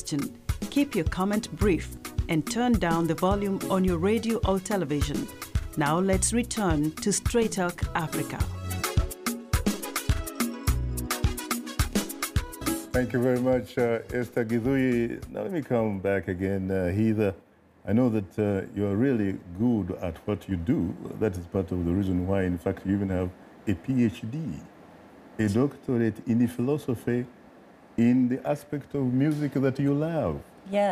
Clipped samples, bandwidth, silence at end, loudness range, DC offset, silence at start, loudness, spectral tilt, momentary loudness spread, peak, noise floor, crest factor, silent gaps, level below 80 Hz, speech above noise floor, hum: under 0.1%; 15.5 kHz; 0 s; 3 LU; under 0.1%; 0 s; -27 LUFS; -6 dB/octave; 8 LU; -12 dBFS; -52 dBFS; 14 dB; none; -40 dBFS; 26 dB; none